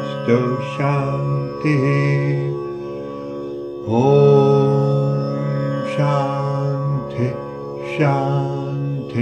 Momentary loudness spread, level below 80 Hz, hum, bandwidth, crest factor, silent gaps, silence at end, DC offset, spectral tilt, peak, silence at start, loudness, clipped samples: 14 LU; -54 dBFS; none; 7 kHz; 18 dB; none; 0 s; under 0.1%; -8.5 dB/octave; 0 dBFS; 0 s; -19 LUFS; under 0.1%